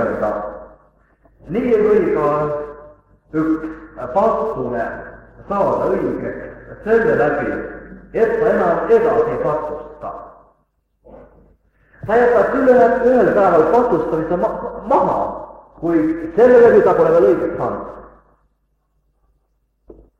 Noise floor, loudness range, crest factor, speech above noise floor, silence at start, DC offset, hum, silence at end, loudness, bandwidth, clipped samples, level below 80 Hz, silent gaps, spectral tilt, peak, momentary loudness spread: -65 dBFS; 7 LU; 16 dB; 50 dB; 0 s; under 0.1%; none; 2.15 s; -16 LUFS; 7 kHz; under 0.1%; -44 dBFS; none; -8.5 dB/octave; 0 dBFS; 19 LU